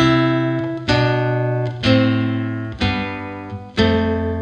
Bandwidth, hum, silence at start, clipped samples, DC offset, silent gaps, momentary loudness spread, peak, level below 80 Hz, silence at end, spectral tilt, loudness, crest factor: 8.6 kHz; none; 0 s; under 0.1%; under 0.1%; none; 10 LU; -2 dBFS; -40 dBFS; 0 s; -7 dB/octave; -19 LUFS; 16 dB